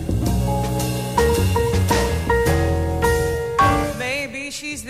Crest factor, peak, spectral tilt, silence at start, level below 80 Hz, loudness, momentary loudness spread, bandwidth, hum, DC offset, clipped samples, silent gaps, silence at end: 14 dB; -6 dBFS; -5.5 dB/octave; 0 s; -28 dBFS; -20 LUFS; 6 LU; 16 kHz; none; 0.2%; under 0.1%; none; 0 s